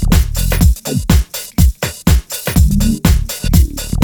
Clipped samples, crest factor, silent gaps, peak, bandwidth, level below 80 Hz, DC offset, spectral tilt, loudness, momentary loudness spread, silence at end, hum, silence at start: under 0.1%; 12 dB; none; 0 dBFS; over 20 kHz; -14 dBFS; under 0.1%; -5 dB/octave; -14 LUFS; 4 LU; 0 s; none; 0 s